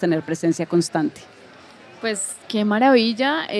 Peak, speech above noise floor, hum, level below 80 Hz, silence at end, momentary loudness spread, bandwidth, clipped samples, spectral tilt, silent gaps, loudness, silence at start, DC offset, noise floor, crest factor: -4 dBFS; 25 dB; none; -68 dBFS; 0 s; 11 LU; 13.5 kHz; under 0.1%; -4.5 dB/octave; none; -20 LUFS; 0 s; under 0.1%; -45 dBFS; 16 dB